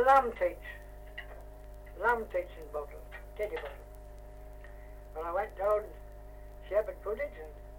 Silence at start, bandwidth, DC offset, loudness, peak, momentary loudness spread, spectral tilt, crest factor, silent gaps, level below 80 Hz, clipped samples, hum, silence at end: 0 s; 16.5 kHz; under 0.1%; -34 LUFS; -12 dBFS; 20 LU; -5.5 dB/octave; 24 dB; none; -48 dBFS; under 0.1%; 50 Hz at -50 dBFS; 0 s